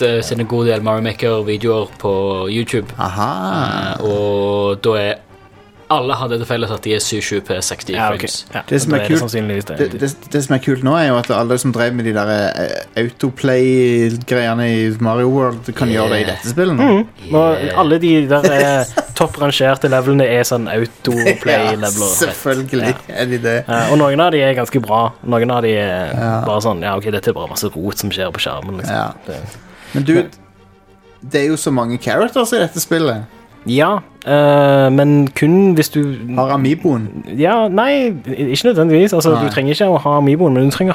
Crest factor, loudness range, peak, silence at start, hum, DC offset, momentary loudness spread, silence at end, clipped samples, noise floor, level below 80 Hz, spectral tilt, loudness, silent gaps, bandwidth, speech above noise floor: 14 dB; 6 LU; 0 dBFS; 0 s; none; under 0.1%; 8 LU; 0 s; under 0.1%; -46 dBFS; -48 dBFS; -5.5 dB/octave; -15 LUFS; none; 17.5 kHz; 31 dB